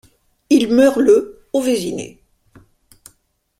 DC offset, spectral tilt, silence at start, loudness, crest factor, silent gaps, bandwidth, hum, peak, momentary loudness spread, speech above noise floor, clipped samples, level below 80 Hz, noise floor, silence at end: under 0.1%; -4.5 dB/octave; 0.5 s; -15 LUFS; 16 dB; none; 15.5 kHz; none; -2 dBFS; 15 LU; 47 dB; under 0.1%; -54 dBFS; -62 dBFS; 1.5 s